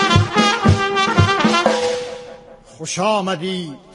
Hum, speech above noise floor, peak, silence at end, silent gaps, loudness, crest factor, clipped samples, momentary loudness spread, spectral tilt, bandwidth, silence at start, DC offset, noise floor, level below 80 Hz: none; 19 dB; 0 dBFS; 0.2 s; none; -17 LUFS; 18 dB; under 0.1%; 13 LU; -5 dB/octave; 11.5 kHz; 0 s; under 0.1%; -40 dBFS; -40 dBFS